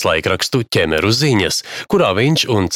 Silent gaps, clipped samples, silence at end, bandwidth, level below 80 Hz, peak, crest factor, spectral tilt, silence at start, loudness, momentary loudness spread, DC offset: none; under 0.1%; 0 s; 17 kHz; -42 dBFS; -2 dBFS; 14 dB; -4.5 dB/octave; 0 s; -15 LUFS; 4 LU; under 0.1%